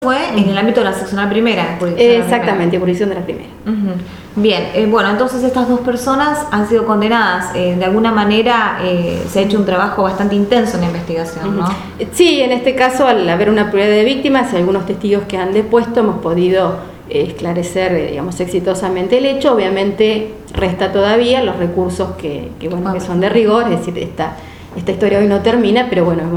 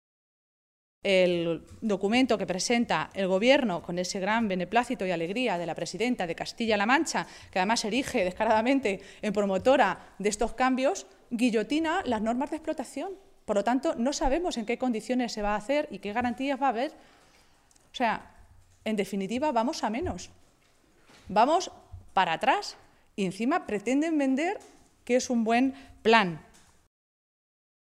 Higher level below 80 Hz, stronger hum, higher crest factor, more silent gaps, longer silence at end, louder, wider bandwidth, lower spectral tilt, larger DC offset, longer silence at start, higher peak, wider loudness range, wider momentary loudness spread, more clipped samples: first, -40 dBFS vs -52 dBFS; neither; second, 14 dB vs 24 dB; neither; second, 0 s vs 1.45 s; first, -14 LUFS vs -28 LUFS; first, 16.5 kHz vs 14 kHz; first, -6 dB/octave vs -4.5 dB/octave; neither; second, 0 s vs 1.05 s; first, 0 dBFS vs -6 dBFS; about the same, 3 LU vs 5 LU; about the same, 9 LU vs 10 LU; neither